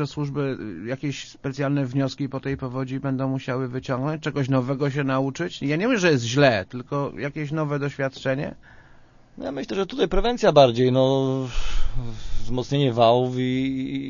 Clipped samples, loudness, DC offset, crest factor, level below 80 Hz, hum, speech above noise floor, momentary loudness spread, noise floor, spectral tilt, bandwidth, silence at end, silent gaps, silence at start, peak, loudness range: under 0.1%; -24 LUFS; under 0.1%; 22 dB; -34 dBFS; none; 28 dB; 13 LU; -50 dBFS; -6.5 dB/octave; 7.4 kHz; 0 s; none; 0 s; -2 dBFS; 6 LU